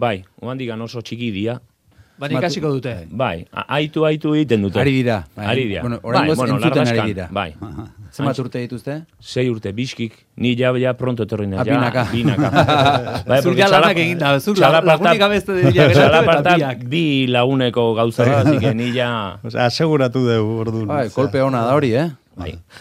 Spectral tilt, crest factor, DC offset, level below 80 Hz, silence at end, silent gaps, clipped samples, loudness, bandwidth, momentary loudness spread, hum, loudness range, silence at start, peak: -6.5 dB/octave; 16 dB; under 0.1%; -50 dBFS; 0 s; none; under 0.1%; -17 LUFS; 15 kHz; 14 LU; none; 9 LU; 0 s; 0 dBFS